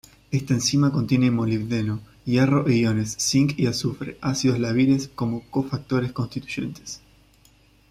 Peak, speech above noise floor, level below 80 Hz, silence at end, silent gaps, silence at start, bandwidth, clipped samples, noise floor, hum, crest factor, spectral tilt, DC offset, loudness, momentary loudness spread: -6 dBFS; 34 dB; -52 dBFS; 0.95 s; none; 0.3 s; 15 kHz; under 0.1%; -56 dBFS; none; 16 dB; -5.5 dB/octave; under 0.1%; -23 LUFS; 10 LU